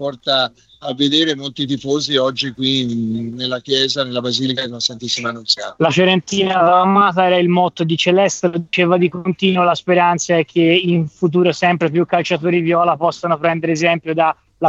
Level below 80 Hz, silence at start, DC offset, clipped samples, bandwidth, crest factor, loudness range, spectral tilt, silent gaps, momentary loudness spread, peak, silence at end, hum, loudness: -60 dBFS; 0 s; under 0.1%; under 0.1%; 8 kHz; 14 dB; 4 LU; -4.5 dB/octave; none; 7 LU; -2 dBFS; 0 s; none; -16 LUFS